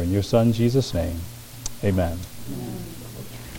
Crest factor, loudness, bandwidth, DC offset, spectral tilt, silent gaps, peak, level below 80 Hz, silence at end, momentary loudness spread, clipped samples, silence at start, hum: 20 dB; -24 LUFS; 17 kHz; under 0.1%; -6.5 dB/octave; none; -4 dBFS; -40 dBFS; 0 s; 18 LU; under 0.1%; 0 s; none